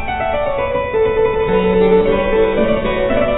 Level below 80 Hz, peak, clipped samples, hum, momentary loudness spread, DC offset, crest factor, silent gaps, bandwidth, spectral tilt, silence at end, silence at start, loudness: -28 dBFS; -2 dBFS; under 0.1%; none; 6 LU; under 0.1%; 12 dB; none; 4.1 kHz; -10.5 dB/octave; 0 s; 0 s; -15 LUFS